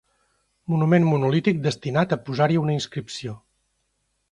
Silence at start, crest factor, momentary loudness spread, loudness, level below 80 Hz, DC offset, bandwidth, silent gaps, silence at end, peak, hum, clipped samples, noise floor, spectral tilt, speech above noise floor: 0.7 s; 18 dB; 15 LU; -22 LUFS; -58 dBFS; under 0.1%; 10 kHz; none; 0.95 s; -6 dBFS; none; under 0.1%; -72 dBFS; -7 dB/octave; 51 dB